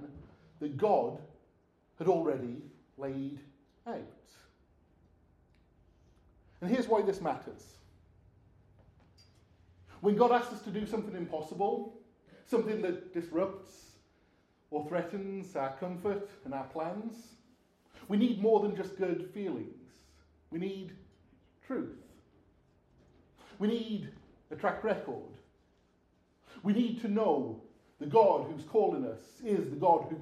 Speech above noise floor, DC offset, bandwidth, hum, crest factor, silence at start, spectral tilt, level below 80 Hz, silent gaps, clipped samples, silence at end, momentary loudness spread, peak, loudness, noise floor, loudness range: 38 dB; under 0.1%; 13.5 kHz; none; 24 dB; 0 s; -7.5 dB/octave; -70 dBFS; none; under 0.1%; 0 s; 19 LU; -12 dBFS; -33 LUFS; -70 dBFS; 11 LU